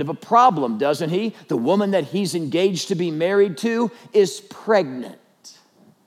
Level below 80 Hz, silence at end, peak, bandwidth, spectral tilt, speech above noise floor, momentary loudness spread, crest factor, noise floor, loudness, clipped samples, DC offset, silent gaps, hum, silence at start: -90 dBFS; 0.55 s; -4 dBFS; 14.5 kHz; -5.5 dB/octave; 34 dB; 8 LU; 18 dB; -54 dBFS; -20 LUFS; under 0.1%; under 0.1%; none; none; 0 s